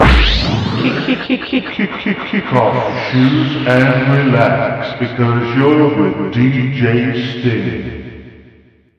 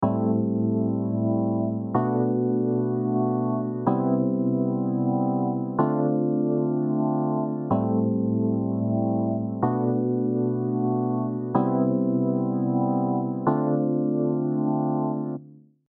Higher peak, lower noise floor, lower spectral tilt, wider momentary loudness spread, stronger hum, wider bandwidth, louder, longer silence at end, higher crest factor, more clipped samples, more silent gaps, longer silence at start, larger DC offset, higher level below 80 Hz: first, 0 dBFS vs -8 dBFS; about the same, -47 dBFS vs -48 dBFS; second, -7.5 dB/octave vs -12.5 dB/octave; first, 8 LU vs 3 LU; neither; first, 8 kHz vs 2 kHz; first, -14 LUFS vs -25 LUFS; first, 0.65 s vs 0.3 s; about the same, 14 dB vs 16 dB; neither; neither; about the same, 0 s vs 0 s; neither; first, -24 dBFS vs -68 dBFS